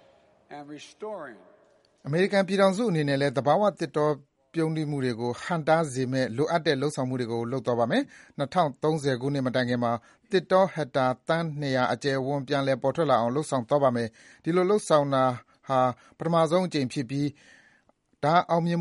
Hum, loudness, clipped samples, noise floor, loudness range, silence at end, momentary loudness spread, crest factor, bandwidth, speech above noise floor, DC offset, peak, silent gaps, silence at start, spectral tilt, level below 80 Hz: none; -26 LUFS; under 0.1%; -66 dBFS; 2 LU; 0 s; 12 LU; 20 dB; 11.5 kHz; 40 dB; under 0.1%; -6 dBFS; none; 0.5 s; -6 dB/octave; -68 dBFS